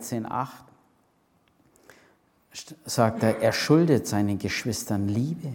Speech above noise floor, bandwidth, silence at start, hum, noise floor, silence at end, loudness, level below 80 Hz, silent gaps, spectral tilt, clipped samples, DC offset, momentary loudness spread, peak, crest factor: 41 dB; 17.5 kHz; 0 s; none; -66 dBFS; 0 s; -25 LUFS; -62 dBFS; none; -5.5 dB/octave; under 0.1%; under 0.1%; 18 LU; -6 dBFS; 20 dB